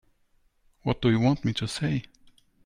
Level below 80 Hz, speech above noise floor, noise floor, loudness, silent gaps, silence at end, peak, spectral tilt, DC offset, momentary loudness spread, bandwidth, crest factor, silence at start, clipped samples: -50 dBFS; 41 dB; -66 dBFS; -27 LUFS; none; 0.65 s; -12 dBFS; -6.5 dB/octave; under 0.1%; 9 LU; 11.5 kHz; 18 dB; 0.85 s; under 0.1%